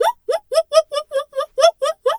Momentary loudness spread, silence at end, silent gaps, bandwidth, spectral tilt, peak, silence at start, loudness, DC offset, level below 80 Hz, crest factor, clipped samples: 8 LU; 0 s; none; 15.5 kHz; 1.5 dB/octave; 0 dBFS; 0 s; -19 LUFS; under 0.1%; -64 dBFS; 18 dB; under 0.1%